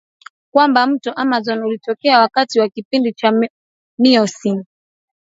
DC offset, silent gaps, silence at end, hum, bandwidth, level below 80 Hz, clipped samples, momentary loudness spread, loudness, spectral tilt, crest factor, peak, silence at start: under 0.1%; 2.85-2.91 s, 3.50-3.98 s; 0.6 s; none; 8 kHz; -70 dBFS; under 0.1%; 9 LU; -16 LUFS; -4.5 dB/octave; 16 dB; 0 dBFS; 0.55 s